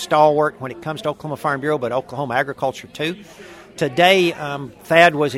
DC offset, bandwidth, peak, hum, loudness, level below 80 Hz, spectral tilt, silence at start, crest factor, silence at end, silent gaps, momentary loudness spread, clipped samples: under 0.1%; 16 kHz; 0 dBFS; none; -19 LUFS; -58 dBFS; -5 dB/octave; 0 s; 18 dB; 0 s; none; 15 LU; under 0.1%